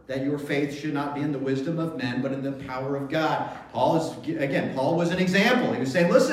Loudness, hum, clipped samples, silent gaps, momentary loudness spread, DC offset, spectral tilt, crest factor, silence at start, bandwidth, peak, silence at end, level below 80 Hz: -25 LUFS; none; under 0.1%; none; 9 LU; under 0.1%; -6 dB/octave; 18 dB; 0.1 s; 15 kHz; -6 dBFS; 0 s; -60 dBFS